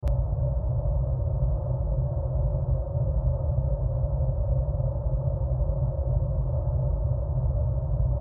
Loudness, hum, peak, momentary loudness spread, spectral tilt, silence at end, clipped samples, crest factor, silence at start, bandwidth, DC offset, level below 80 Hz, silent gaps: -28 LUFS; none; -12 dBFS; 1 LU; -13.5 dB/octave; 0 s; under 0.1%; 12 dB; 0 s; 1.6 kHz; under 0.1%; -28 dBFS; none